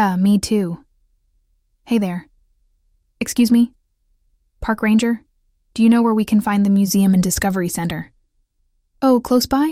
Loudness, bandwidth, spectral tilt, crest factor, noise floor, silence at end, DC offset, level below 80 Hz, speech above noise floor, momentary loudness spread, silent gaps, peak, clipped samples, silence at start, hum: -17 LUFS; 16 kHz; -5.5 dB/octave; 14 dB; -65 dBFS; 0 s; under 0.1%; -44 dBFS; 49 dB; 13 LU; none; -4 dBFS; under 0.1%; 0 s; none